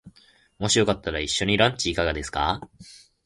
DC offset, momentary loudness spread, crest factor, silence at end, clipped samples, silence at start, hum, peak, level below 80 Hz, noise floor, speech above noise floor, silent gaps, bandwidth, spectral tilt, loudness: under 0.1%; 9 LU; 22 dB; 0.3 s; under 0.1%; 0.05 s; none; -4 dBFS; -42 dBFS; -58 dBFS; 34 dB; none; 11.5 kHz; -3.5 dB/octave; -23 LUFS